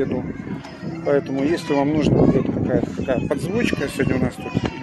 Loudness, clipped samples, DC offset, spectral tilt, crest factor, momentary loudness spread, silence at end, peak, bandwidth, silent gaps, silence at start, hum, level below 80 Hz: -21 LUFS; under 0.1%; under 0.1%; -7 dB/octave; 16 dB; 12 LU; 0 s; -4 dBFS; 12.5 kHz; none; 0 s; none; -40 dBFS